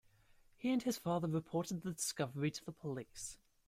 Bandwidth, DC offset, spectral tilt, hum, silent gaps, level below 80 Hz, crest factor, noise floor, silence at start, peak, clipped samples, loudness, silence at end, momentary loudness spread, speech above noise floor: 16 kHz; under 0.1%; -5 dB/octave; none; none; -70 dBFS; 18 dB; -68 dBFS; 0.6 s; -24 dBFS; under 0.1%; -40 LUFS; 0.3 s; 9 LU; 28 dB